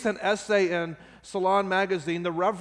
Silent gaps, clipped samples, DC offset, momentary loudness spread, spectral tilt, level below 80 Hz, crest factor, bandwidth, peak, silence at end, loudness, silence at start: none; under 0.1%; under 0.1%; 11 LU; -5 dB/octave; -64 dBFS; 16 dB; 10.5 kHz; -10 dBFS; 0 s; -26 LUFS; 0 s